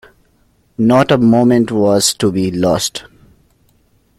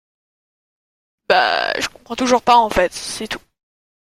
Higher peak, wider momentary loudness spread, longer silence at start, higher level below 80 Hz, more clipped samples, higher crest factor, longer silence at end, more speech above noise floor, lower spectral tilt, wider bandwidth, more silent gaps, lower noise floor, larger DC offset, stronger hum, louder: about the same, 0 dBFS vs -2 dBFS; second, 9 LU vs 13 LU; second, 0.8 s vs 1.3 s; about the same, -48 dBFS vs -44 dBFS; neither; about the same, 14 dB vs 18 dB; first, 1.15 s vs 0.75 s; second, 43 dB vs over 74 dB; first, -5 dB/octave vs -2.5 dB/octave; second, 14.5 kHz vs 16 kHz; neither; second, -56 dBFS vs under -90 dBFS; neither; neither; first, -13 LUFS vs -17 LUFS